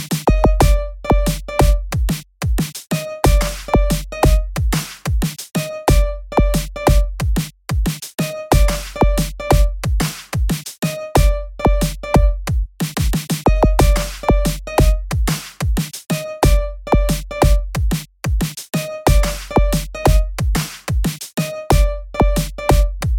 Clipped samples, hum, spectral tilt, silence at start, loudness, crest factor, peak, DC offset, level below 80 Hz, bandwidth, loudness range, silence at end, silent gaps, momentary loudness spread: under 0.1%; none; -5.5 dB/octave; 0 s; -19 LUFS; 16 dB; 0 dBFS; under 0.1%; -18 dBFS; 17 kHz; 1 LU; 0 s; none; 7 LU